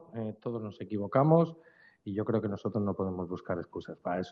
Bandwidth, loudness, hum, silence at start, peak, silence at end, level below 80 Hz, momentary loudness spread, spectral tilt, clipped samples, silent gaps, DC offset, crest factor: 6.4 kHz; -32 LUFS; none; 0 s; -10 dBFS; 0 s; -72 dBFS; 14 LU; -8.5 dB/octave; under 0.1%; none; under 0.1%; 22 dB